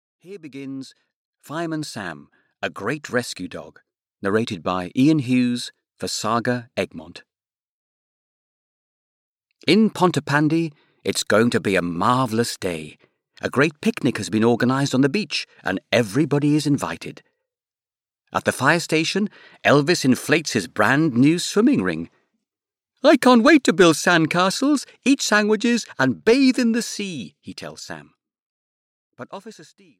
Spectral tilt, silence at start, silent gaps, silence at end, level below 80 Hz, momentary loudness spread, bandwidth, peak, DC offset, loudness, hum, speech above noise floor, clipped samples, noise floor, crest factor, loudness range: -5 dB/octave; 0.25 s; 1.16-1.33 s, 7.59-9.40 s, 28.42-29.10 s; 0.35 s; -64 dBFS; 17 LU; 16 kHz; -4 dBFS; under 0.1%; -20 LUFS; none; over 70 dB; under 0.1%; under -90 dBFS; 18 dB; 11 LU